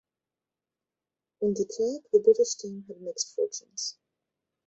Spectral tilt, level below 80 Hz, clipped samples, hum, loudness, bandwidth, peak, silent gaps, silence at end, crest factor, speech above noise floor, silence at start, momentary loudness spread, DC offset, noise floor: -4.5 dB/octave; -74 dBFS; under 0.1%; none; -28 LUFS; 8.2 kHz; -10 dBFS; none; 0.75 s; 20 dB; 62 dB; 1.4 s; 14 LU; under 0.1%; -90 dBFS